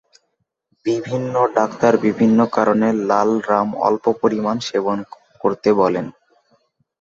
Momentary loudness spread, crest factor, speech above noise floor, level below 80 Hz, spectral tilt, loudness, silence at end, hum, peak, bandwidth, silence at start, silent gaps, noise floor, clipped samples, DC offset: 8 LU; 18 dB; 55 dB; -60 dBFS; -6.5 dB/octave; -18 LUFS; 0.9 s; none; -2 dBFS; 7.6 kHz; 0.85 s; none; -72 dBFS; under 0.1%; under 0.1%